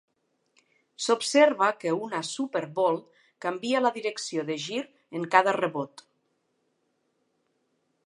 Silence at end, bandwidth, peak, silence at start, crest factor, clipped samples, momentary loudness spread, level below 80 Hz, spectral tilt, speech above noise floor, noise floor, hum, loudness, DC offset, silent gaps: 2.2 s; 11.5 kHz; -4 dBFS; 1 s; 26 dB; under 0.1%; 13 LU; -86 dBFS; -3.5 dB/octave; 48 dB; -74 dBFS; none; -27 LUFS; under 0.1%; none